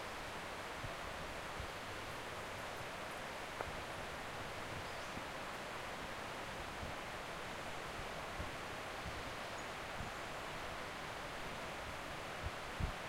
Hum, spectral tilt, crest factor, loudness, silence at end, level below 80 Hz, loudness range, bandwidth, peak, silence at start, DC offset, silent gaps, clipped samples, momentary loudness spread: none; -3.5 dB/octave; 20 dB; -45 LUFS; 0 s; -58 dBFS; 0 LU; 16 kHz; -26 dBFS; 0 s; under 0.1%; none; under 0.1%; 1 LU